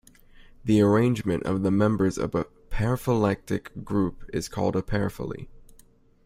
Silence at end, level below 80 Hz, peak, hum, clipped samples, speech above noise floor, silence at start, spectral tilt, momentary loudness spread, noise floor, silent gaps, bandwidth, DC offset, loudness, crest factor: 0.65 s; -44 dBFS; -8 dBFS; none; under 0.1%; 31 dB; 0.65 s; -7.5 dB/octave; 12 LU; -56 dBFS; none; 16 kHz; under 0.1%; -26 LUFS; 18 dB